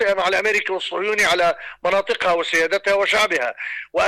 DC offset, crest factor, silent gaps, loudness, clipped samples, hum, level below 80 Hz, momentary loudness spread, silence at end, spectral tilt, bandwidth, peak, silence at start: under 0.1%; 10 dB; none; -19 LUFS; under 0.1%; none; -54 dBFS; 8 LU; 0 s; -2 dB/octave; 15.5 kHz; -10 dBFS; 0 s